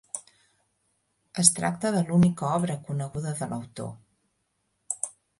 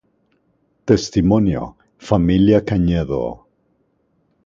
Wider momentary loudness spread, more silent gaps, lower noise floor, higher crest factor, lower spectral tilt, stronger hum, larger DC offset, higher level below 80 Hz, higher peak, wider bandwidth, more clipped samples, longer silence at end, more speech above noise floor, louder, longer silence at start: first, 18 LU vs 13 LU; neither; first, -75 dBFS vs -64 dBFS; first, 28 dB vs 18 dB; second, -4.5 dB/octave vs -7.5 dB/octave; neither; neither; second, -62 dBFS vs -36 dBFS; about the same, 0 dBFS vs 0 dBFS; first, 11.5 kHz vs 7.6 kHz; neither; second, 0.3 s vs 1.1 s; about the same, 50 dB vs 48 dB; second, -26 LUFS vs -17 LUFS; second, 0.15 s vs 0.85 s